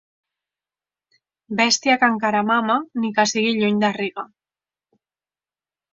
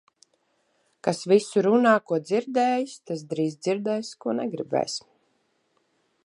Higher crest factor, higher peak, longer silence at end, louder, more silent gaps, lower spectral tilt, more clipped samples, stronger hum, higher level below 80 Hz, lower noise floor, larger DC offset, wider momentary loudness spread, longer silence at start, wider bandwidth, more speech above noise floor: about the same, 20 dB vs 20 dB; first, -2 dBFS vs -6 dBFS; first, 1.7 s vs 1.25 s; first, -19 LUFS vs -25 LUFS; neither; second, -3 dB/octave vs -5 dB/octave; neither; first, 50 Hz at -55 dBFS vs none; first, -68 dBFS vs -76 dBFS; first, under -90 dBFS vs -70 dBFS; neither; about the same, 11 LU vs 11 LU; first, 1.5 s vs 1.05 s; second, 7.8 kHz vs 11.5 kHz; first, over 71 dB vs 46 dB